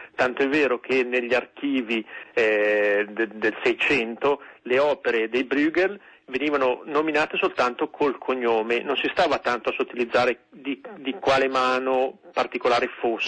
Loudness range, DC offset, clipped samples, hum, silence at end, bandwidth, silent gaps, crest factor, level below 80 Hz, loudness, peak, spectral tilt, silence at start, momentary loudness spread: 1 LU; under 0.1%; under 0.1%; none; 0 s; 9.4 kHz; none; 14 dB; -62 dBFS; -23 LUFS; -10 dBFS; -4.5 dB/octave; 0 s; 7 LU